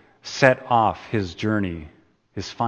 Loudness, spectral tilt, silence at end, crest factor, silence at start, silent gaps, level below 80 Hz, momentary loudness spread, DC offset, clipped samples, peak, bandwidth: -21 LUFS; -5.5 dB/octave; 0 s; 24 dB; 0.25 s; none; -52 dBFS; 16 LU; under 0.1%; under 0.1%; 0 dBFS; 8.8 kHz